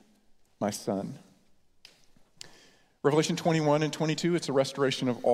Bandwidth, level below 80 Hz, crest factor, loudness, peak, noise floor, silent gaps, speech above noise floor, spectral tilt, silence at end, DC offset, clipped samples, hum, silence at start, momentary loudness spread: 15.5 kHz; -70 dBFS; 18 dB; -28 LUFS; -12 dBFS; -62 dBFS; none; 34 dB; -5.5 dB/octave; 0 s; under 0.1%; under 0.1%; none; 0.6 s; 23 LU